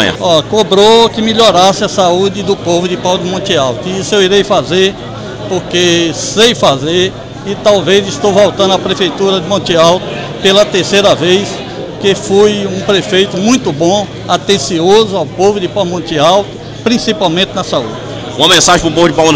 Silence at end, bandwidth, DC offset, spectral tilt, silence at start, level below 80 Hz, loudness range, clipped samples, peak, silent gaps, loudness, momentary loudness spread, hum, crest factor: 0 s; 16 kHz; under 0.1%; -4 dB/octave; 0 s; -38 dBFS; 2 LU; under 0.1%; 0 dBFS; none; -10 LUFS; 8 LU; none; 10 dB